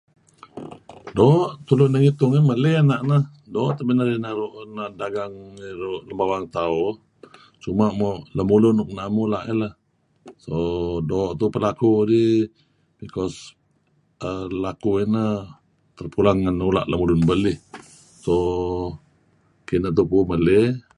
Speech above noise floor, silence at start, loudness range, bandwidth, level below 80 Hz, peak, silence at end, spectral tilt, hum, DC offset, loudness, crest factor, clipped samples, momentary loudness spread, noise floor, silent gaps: 43 dB; 0.55 s; 7 LU; 10.5 kHz; -44 dBFS; -2 dBFS; 0.2 s; -8.5 dB/octave; none; under 0.1%; -21 LUFS; 18 dB; under 0.1%; 16 LU; -64 dBFS; none